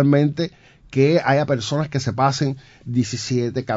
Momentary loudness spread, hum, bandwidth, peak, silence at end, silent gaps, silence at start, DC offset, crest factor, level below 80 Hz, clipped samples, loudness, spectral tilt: 10 LU; none; 7.8 kHz; -4 dBFS; 0 s; none; 0 s; under 0.1%; 16 dB; -54 dBFS; under 0.1%; -21 LUFS; -6 dB/octave